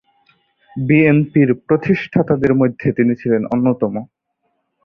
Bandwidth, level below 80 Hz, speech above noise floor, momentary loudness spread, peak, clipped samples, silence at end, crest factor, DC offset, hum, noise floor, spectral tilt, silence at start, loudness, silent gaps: 6 kHz; -50 dBFS; 54 dB; 9 LU; -2 dBFS; under 0.1%; 0.8 s; 16 dB; under 0.1%; none; -69 dBFS; -10.5 dB/octave; 0.75 s; -16 LUFS; none